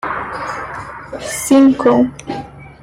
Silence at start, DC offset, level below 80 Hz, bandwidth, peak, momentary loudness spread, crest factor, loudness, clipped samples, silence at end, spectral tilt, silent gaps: 0.05 s; under 0.1%; -46 dBFS; 16 kHz; -2 dBFS; 18 LU; 14 dB; -15 LUFS; under 0.1%; 0.1 s; -5 dB/octave; none